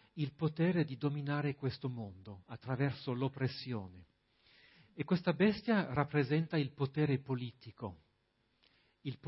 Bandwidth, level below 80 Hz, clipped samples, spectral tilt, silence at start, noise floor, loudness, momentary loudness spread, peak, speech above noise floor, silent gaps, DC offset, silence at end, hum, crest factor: 5.8 kHz; -70 dBFS; under 0.1%; -6.5 dB/octave; 0.15 s; -77 dBFS; -36 LUFS; 15 LU; -16 dBFS; 42 dB; none; under 0.1%; 0 s; none; 22 dB